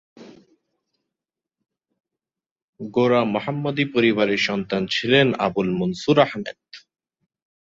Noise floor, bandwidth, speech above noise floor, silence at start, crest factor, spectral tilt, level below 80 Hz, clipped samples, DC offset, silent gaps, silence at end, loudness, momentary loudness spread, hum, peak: -87 dBFS; 7.8 kHz; 67 dB; 0.2 s; 22 dB; -6 dB/octave; -60 dBFS; under 0.1%; under 0.1%; 2.51-2.56 s, 2.62-2.73 s; 0.95 s; -20 LUFS; 9 LU; none; -2 dBFS